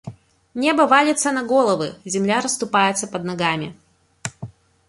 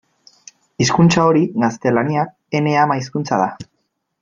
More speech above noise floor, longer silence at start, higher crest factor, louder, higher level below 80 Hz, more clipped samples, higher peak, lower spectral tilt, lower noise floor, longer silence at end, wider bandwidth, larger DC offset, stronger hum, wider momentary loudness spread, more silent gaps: second, 20 dB vs 55 dB; second, 0.05 s vs 0.8 s; about the same, 18 dB vs 16 dB; about the same, -19 LUFS vs -17 LUFS; second, -60 dBFS vs -52 dBFS; neither; about the same, -2 dBFS vs -2 dBFS; second, -3.5 dB/octave vs -5.5 dB/octave; second, -39 dBFS vs -70 dBFS; second, 0.4 s vs 0.6 s; first, 11.5 kHz vs 7.6 kHz; neither; neither; first, 19 LU vs 9 LU; neither